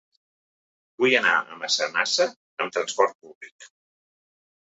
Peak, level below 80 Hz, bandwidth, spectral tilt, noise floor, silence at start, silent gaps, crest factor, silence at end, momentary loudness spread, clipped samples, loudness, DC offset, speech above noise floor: -4 dBFS; -78 dBFS; 8.2 kHz; -1.5 dB/octave; under -90 dBFS; 1 s; 2.36-2.57 s, 3.15-3.19 s, 3.35-3.41 s, 3.52-3.59 s; 22 dB; 1 s; 11 LU; under 0.1%; -23 LUFS; under 0.1%; over 66 dB